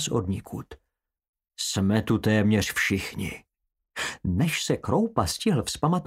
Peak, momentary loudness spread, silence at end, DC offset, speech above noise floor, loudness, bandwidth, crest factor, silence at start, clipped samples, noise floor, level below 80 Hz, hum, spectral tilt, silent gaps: -6 dBFS; 12 LU; 0 s; under 0.1%; 48 dB; -26 LUFS; 16 kHz; 20 dB; 0 s; under 0.1%; -74 dBFS; -50 dBFS; none; -5 dB/octave; 1.29-1.33 s